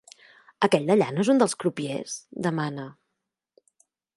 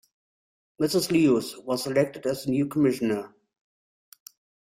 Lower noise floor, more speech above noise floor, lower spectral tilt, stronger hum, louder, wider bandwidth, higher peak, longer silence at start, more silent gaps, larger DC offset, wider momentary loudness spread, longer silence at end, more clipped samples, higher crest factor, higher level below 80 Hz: second, -83 dBFS vs under -90 dBFS; second, 58 dB vs over 66 dB; about the same, -5.5 dB/octave vs -5.5 dB/octave; neither; about the same, -25 LUFS vs -25 LUFS; second, 11.5 kHz vs 16 kHz; first, -4 dBFS vs -10 dBFS; second, 0.6 s vs 0.8 s; neither; neither; first, 13 LU vs 9 LU; second, 1.25 s vs 1.5 s; neither; about the same, 22 dB vs 18 dB; second, -74 dBFS vs -66 dBFS